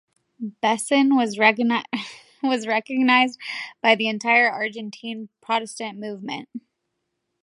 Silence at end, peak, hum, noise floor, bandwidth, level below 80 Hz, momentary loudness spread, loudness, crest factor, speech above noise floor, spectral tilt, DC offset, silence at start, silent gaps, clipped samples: 0.85 s; -2 dBFS; none; -77 dBFS; 11.5 kHz; -80 dBFS; 16 LU; -21 LUFS; 22 dB; 55 dB; -3.5 dB/octave; under 0.1%; 0.4 s; none; under 0.1%